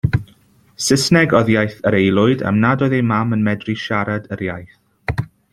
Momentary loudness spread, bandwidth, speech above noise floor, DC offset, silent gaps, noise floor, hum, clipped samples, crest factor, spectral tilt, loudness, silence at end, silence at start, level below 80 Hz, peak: 12 LU; 14.5 kHz; 36 dB; under 0.1%; none; -52 dBFS; none; under 0.1%; 16 dB; -5.5 dB/octave; -17 LUFS; 0.3 s; 0.05 s; -42 dBFS; -2 dBFS